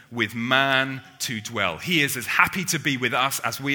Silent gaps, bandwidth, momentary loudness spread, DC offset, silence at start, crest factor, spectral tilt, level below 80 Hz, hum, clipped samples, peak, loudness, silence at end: none; over 20 kHz; 9 LU; under 0.1%; 0.1 s; 24 dB; -3 dB/octave; -60 dBFS; none; under 0.1%; 0 dBFS; -22 LUFS; 0 s